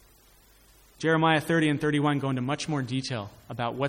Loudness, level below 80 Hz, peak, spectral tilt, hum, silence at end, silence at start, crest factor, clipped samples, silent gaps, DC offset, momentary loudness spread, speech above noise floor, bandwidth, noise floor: -27 LUFS; -60 dBFS; -8 dBFS; -6 dB/octave; none; 0 s; 1 s; 18 dB; under 0.1%; none; under 0.1%; 11 LU; 32 dB; 16.5 kHz; -58 dBFS